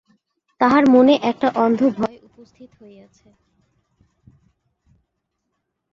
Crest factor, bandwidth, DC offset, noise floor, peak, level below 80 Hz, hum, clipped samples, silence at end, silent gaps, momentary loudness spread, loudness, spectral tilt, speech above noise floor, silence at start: 18 dB; 7.2 kHz; under 0.1%; -76 dBFS; -2 dBFS; -62 dBFS; none; under 0.1%; 3.3 s; none; 9 LU; -16 LUFS; -6.5 dB/octave; 58 dB; 0.6 s